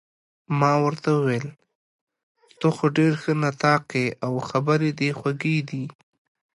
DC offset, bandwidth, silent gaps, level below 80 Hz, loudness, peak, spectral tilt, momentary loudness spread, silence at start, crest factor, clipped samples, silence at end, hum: under 0.1%; 11.5 kHz; 1.75-2.07 s, 2.23-2.35 s; -66 dBFS; -23 LUFS; -6 dBFS; -7 dB/octave; 8 LU; 0.5 s; 18 dB; under 0.1%; 0.65 s; none